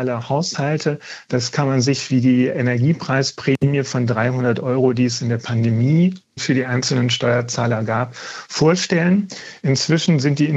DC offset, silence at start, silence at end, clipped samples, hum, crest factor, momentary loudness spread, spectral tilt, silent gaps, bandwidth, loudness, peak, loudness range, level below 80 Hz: under 0.1%; 0 s; 0 s; under 0.1%; none; 14 dB; 6 LU; -5.5 dB/octave; none; 8.2 kHz; -18 LUFS; -4 dBFS; 1 LU; -60 dBFS